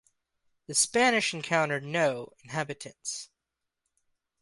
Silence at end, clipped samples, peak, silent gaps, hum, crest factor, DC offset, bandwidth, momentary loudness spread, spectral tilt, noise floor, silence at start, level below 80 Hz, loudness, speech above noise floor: 1.15 s; under 0.1%; -8 dBFS; none; none; 22 dB; under 0.1%; 12 kHz; 14 LU; -2.5 dB/octave; -86 dBFS; 0.7 s; -72 dBFS; -28 LUFS; 57 dB